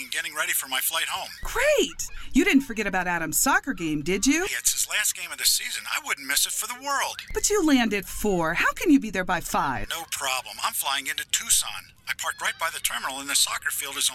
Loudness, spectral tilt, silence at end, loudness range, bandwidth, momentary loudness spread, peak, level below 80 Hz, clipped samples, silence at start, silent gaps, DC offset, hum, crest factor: -24 LUFS; -1.5 dB/octave; 0 s; 2 LU; 16.5 kHz; 8 LU; -8 dBFS; -44 dBFS; under 0.1%; 0 s; none; under 0.1%; none; 18 dB